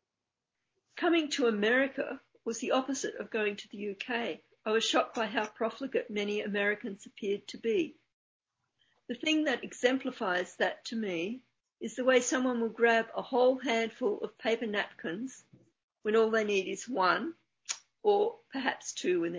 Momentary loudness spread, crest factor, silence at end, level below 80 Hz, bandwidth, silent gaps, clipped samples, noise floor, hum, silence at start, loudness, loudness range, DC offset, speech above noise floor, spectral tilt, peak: 12 LU; 20 dB; 0 s; -82 dBFS; 8 kHz; 8.13-8.40 s, 15.84-15.88 s; under 0.1%; -89 dBFS; none; 0.95 s; -31 LUFS; 4 LU; under 0.1%; 58 dB; -3.5 dB/octave; -12 dBFS